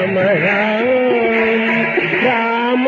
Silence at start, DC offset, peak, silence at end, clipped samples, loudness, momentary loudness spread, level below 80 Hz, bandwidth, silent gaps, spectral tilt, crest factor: 0 s; under 0.1%; -4 dBFS; 0 s; under 0.1%; -14 LUFS; 1 LU; -56 dBFS; 7 kHz; none; -7 dB/octave; 12 dB